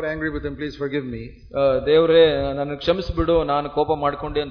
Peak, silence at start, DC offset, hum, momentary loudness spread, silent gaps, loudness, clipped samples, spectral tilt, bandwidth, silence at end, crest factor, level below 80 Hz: -4 dBFS; 0 s; under 0.1%; none; 13 LU; none; -21 LUFS; under 0.1%; -7.5 dB/octave; 5.4 kHz; 0 s; 16 dB; -38 dBFS